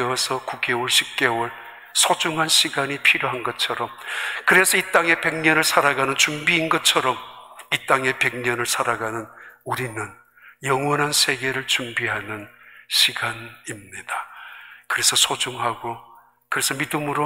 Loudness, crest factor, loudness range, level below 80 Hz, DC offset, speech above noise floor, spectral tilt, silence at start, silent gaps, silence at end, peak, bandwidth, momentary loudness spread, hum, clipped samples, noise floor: -20 LUFS; 22 dB; 6 LU; -64 dBFS; under 0.1%; 20 dB; -1.5 dB/octave; 0 s; none; 0 s; -2 dBFS; 16 kHz; 16 LU; none; under 0.1%; -42 dBFS